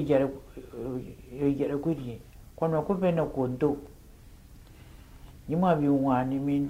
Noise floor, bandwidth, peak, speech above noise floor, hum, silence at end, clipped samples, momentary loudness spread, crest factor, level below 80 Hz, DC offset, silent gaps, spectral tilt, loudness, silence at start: -51 dBFS; 15.5 kHz; -12 dBFS; 23 dB; none; 0 s; under 0.1%; 17 LU; 18 dB; -52 dBFS; under 0.1%; none; -9 dB/octave; -28 LUFS; 0 s